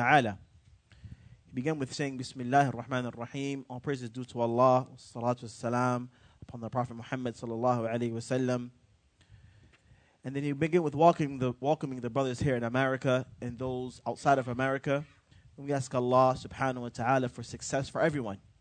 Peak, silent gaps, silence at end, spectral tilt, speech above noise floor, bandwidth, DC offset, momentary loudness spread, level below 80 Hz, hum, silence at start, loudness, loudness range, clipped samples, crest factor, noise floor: -8 dBFS; none; 0.25 s; -6 dB/octave; 35 dB; 9.4 kHz; under 0.1%; 13 LU; -62 dBFS; none; 0 s; -31 LUFS; 4 LU; under 0.1%; 24 dB; -65 dBFS